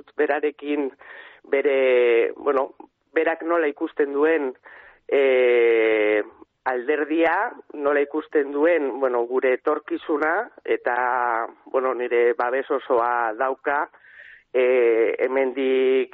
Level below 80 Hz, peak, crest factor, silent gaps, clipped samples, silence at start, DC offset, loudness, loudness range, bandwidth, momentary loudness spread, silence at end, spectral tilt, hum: -72 dBFS; -8 dBFS; 14 dB; none; under 0.1%; 0.2 s; under 0.1%; -22 LUFS; 2 LU; 4.1 kHz; 9 LU; 0.05 s; -1 dB/octave; none